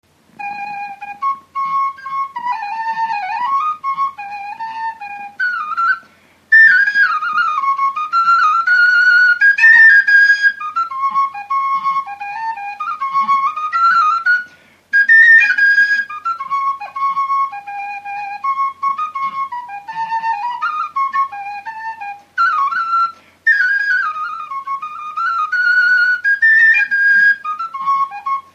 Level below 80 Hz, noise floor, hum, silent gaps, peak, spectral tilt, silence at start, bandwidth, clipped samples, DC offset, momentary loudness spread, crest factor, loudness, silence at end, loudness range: -74 dBFS; -49 dBFS; none; none; 0 dBFS; 0 dB/octave; 0.4 s; 8.6 kHz; under 0.1%; under 0.1%; 17 LU; 14 dB; -13 LUFS; 0.15 s; 11 LU